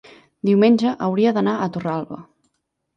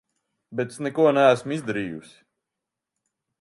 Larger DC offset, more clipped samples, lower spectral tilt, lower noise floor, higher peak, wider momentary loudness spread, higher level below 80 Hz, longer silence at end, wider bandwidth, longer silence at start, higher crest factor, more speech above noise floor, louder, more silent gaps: neither; neither; first, -8 dB/octave vs -6 dB/octave; second, -73 dBFS vs -85 dBFS; about the same, -4 dBFS vs -4 dBFS; second, 13 LU vs 17 LU; about the same, -64 dBFS vs -68 dBFS; second, 0.75 s vs 1.4 s; second, 7.4 kHz vs 11.5 kHz; about the same, 0.45 s vs 0.5 s; second, 16 dB vs 22 dB; second, 55 dB vs 63 dB; first, -19 LUFS vs -22 LUFS; neither